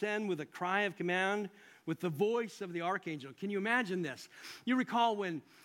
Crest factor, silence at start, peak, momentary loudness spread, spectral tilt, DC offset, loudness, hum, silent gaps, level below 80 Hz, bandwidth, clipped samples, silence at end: 18 dB; 0 s; -16 dBFS; 11 LU; -5.5 dB/octave; under 0.1%; -35 LUFS; none; none; -86 dBFS; 16.5 kHz; under 0.1%; 0.25 s